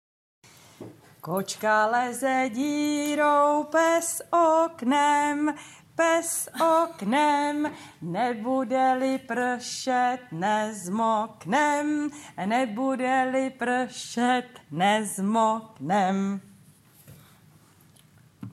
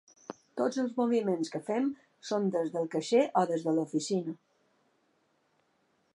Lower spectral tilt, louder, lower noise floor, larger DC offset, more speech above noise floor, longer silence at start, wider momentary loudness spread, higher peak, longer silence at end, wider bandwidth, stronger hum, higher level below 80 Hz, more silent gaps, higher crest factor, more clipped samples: second, -4 dB/octave vs -5.5 dB/octave; first, -25 LUFS vs -31 LUFS; second, -57 dBFS vs -73 dBFS; neither; second, 32 dB vs 43 dB; first, 0.8 s vs 0.3 s; second, 9 LU vs 15 LU; first, -10 dBFS vs -14 dBFS; second, 0 s vs 1.8 s; first, 15.5 kHz vs 11.5 kHz; neither; first, -76 dBFS vs -86 dBFS; neither; about the same, 16 dB vs 20 dB; neither